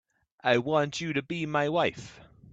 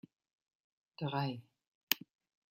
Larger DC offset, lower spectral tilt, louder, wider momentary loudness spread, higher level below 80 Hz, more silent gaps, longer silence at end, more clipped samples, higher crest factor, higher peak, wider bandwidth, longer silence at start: neither; about the same, -5 dB/octave vs -4 dB/octave; first, -28 LUFS vs -38 LUFS; about the same, 9 LU vs 7 LU; first, -66 dBFS vs -84 dBFS; second, none vs 1.67-1.87 s; second, 0.25 s vs 0.55 s; neither; second, 20 dB vs 34 dB; about the same, -10 dBFS vs -8 dBFS; second, 8.4 kHz vs 16 kHz; second, 0.45 s vs 1 s